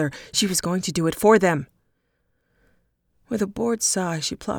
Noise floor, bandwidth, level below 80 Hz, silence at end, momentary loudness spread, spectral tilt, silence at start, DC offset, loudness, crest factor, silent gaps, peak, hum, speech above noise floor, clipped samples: -71 dBFS; 19.5 kHz; -54 dBFS; 0 s; 11 LU; -4 dB/octave; 0 s; under 0.1%; -22 LUFS; 20 dB; none; -4 dBFS; none; 49 dB; under 0.1%